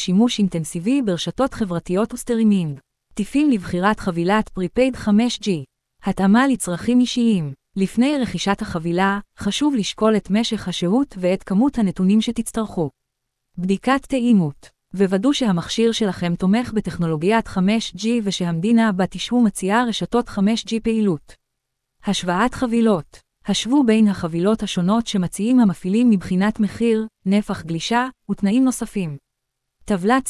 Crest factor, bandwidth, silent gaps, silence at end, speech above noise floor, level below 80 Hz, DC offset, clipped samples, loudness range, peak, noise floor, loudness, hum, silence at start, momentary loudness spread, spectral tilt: 16 dB; 12 kHz; none; 0 s; 58 dB; -46 dBFS; under 0.1%; under 0.1%; 2 LU; -2 dBFS; -77 dBFS; -20 LUFS; none; 0 s; 8 LU; -5.5 dB/octave